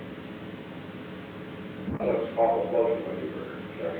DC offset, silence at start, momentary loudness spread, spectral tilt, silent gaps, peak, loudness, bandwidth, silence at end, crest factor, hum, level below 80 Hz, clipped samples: under 0.1%; 0 s; 15 LU; -8.5 dB/octave; none; -12 dBFS; -31 LUFS; 4.7 kHz; 0 s; 18 dB; none; -58 dBFS; under 0.1%